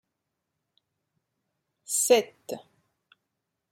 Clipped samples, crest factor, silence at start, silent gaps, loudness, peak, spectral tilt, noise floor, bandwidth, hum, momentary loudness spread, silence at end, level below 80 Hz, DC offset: under 0.1%; 24 dB; 1.9 s; none; -24 LUFS; -8 dBFS; -1 dB/octave; -83 dBFS; 16.5 kHz; none; 19 LU; 1.15 s; -84 dBFS; under 0.1%